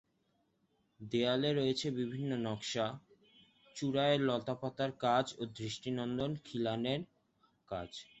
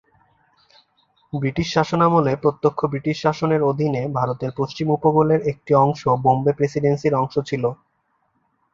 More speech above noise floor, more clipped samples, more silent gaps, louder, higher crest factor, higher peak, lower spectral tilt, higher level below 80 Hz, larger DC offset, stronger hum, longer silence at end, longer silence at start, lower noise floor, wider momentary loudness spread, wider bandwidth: second, 42 dB vs 49 dB; neither; neither; second, -36 LUFS vs -20 LUFS; about the same, 18 dB vs 18 dB; second, -18 dBFS vs -2 dBFS; second, -5.5 dB/octave vs -7.5 dB/octave; second, -70 dBFS vs -52 dBFS; neither; neither; second, 0.15 s vs 1 s; second, 1 s vs 1.35 s; first, -77 dBFS vs -68 dBFS; first, 12 LU vs 8 LU; about the same, 8.2 kHz vs 7.6 kHz